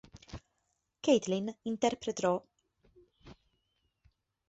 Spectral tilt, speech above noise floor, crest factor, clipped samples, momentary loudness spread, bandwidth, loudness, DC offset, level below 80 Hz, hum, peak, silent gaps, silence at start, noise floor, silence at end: -4.5 dB/octave; 50 dB; 22 dB; under 0.1%; 21 LU; 8.2 kHz; -32 LUFS; under 0.1%; -64 dBFS; none; -14 dBFS; none; 0.15 s; -81 dBFS; 1.15 s